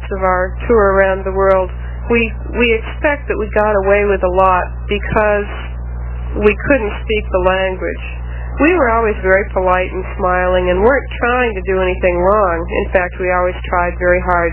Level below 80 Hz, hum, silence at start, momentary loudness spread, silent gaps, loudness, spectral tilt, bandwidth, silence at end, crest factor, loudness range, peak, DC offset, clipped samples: -24 dBFS; 60 Hz at -25 dBFS; 0 s; 9 LU; none; -14 LUFS; -10 dB/octave; 4 kHz; 0 s; 14 dB; 2 LU; 0 dBFS; under 0.1%; under 0.1%